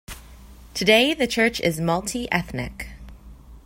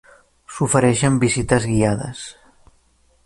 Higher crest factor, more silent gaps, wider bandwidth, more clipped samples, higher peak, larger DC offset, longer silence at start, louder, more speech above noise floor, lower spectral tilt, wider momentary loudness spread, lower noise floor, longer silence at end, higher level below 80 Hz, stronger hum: about the same, 20 dB vs 18 dB; neither; first, 16.5 kHz vs 11.5 kHz; neither; about the same, -4 dBFS vs -2 dBFS; neither; second, 0.1 s vs 0.5 s; second, -21 LUFS vs -18 LUFS; second, 23 dB vs 40 dB; second, -4 dB/octave vs -5.5 dB/octave; first, 21 LU vs 18 LU; second, -44 dBFS vs -58 dBFS; second, 0.05 s vs 0.95 s; about the same, -44 dBFS vs -42 dBFS; neither